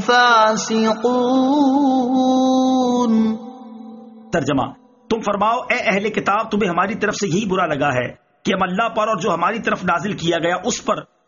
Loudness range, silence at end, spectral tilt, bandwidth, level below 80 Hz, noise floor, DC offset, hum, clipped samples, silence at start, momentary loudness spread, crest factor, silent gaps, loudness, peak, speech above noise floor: 4 LU; 0.25 s; -3.5 dB/octave; 7.4 kHz; -54 dBFS; -38 dBFS; under 0.1%; none; under 0.1%; 0 s; 8 LU; 16 dB; none; -18 LUFS; -2 dBFS; 21 dB